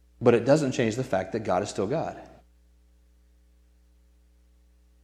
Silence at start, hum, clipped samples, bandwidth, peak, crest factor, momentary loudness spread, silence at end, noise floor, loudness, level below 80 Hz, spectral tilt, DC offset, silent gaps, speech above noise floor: 0.2 s; 60 Hz at -55 dBFS; under 0.1%; 12.5 kHz; -6 dBFS; 24 dB; 9 LU; 2.75 s; -59 dBFS; -26 LUFS; -58 dBFS; -6 dB/octave; under 0.1%; none; 35 dB